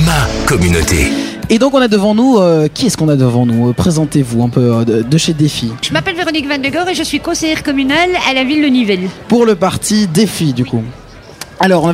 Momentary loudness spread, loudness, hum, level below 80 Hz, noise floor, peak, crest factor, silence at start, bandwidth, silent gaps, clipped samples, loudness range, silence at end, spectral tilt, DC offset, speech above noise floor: 5 LU; -12 LUFS; none; -30 dBFS; -32 dBFS; 0 dBFS; 12 dB; 0 s; 16 kHz; none; under 0.1%; 3 LU; 0 s; -5 dB/octave; under 0.1%; 20 dB